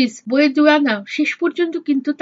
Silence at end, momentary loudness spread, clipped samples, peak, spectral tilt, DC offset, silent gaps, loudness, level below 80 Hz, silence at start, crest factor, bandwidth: 0.05 s; 7 LU; under 0.1%; -2 dBFS; -4 dB/octave; under 0.1%; none; -17 LUFS; -78 dBFS; 0 s; 16 dB; 7.8 kHz